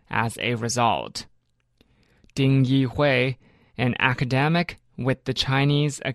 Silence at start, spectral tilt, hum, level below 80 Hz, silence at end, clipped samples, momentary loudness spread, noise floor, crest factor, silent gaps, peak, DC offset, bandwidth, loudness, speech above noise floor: 0.1 s; -5.5 dB/octave; none; -52 dBFS; 0 s; under 0.1%; 11 LU; -64 dBFS; 20 dB; none; -4 dBFS; under 0.1%; 12.5 kHz; -23 LUFS; 42 dB